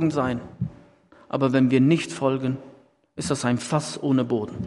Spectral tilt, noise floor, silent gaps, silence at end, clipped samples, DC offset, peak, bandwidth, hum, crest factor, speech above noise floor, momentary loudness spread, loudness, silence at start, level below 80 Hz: -6 dB/octave; -53 dBFS; none; 0 s; under 0.1%; under 0.1%; -6 dBFS; 11.5 kHz; none; 18 dB; 31 dB; 14 LU; -24 LUFS; 0 s; -58 dBFS